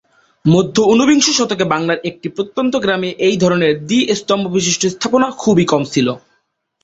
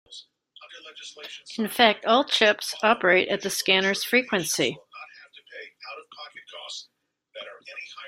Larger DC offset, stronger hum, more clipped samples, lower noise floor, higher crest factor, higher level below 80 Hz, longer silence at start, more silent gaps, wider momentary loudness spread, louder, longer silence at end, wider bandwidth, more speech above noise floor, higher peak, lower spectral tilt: neither; neither; neither; second, -64 dBFS vs -68 dBFS; second, 14 dB vs 24 dB; first, -52 dBFS vs -72 dBFS; first, 0.45 s vs 0.1 s; neither; second, 8 LU vs 23 LU; first, -15 LUFS vs -22 LUFS; first, 0.65 s vs 0 s; second, 8.2 kHz vs 16 kHz; first, 50 dB vs 44 dB; about the same, 0 dBFS vs -2 dBFS; first, -4.5 dB/octave vs -2.5 dB/octave